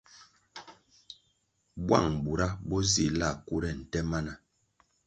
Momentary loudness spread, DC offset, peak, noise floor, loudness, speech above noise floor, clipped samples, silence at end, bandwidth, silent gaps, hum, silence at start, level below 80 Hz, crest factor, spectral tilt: 24 LU; under 0.1%; -8 dBFS; -74 dBFS; -30 LUFS; 45 dB; under 0.1%; 0.7 s; 9.4 kHz; none; none; 0.15 s; -46 dBFS; 26 dB; -4.5 dB/octave